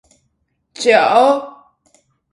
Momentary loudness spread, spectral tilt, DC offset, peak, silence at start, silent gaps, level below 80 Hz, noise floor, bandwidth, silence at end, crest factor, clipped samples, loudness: 11 LU; -3 dB/octave; under 0.1%; 0 dBFS; 0.8 s; none; -64 dBFS; -67 dBFS; 11.5 kHz; 0.8 s; 18 dB; under 0.1%; -13 LUFS